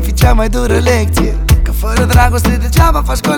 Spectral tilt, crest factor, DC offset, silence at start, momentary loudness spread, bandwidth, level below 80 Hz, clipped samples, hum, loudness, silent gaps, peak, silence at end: -5.5 dB/octave; 10 dB; under 0.1%; 0 s; 4 LU; 19.5 kHz; -12 dBFS; under 0.1%; none; -12 LUFS; none; 0 dBFS; 0 s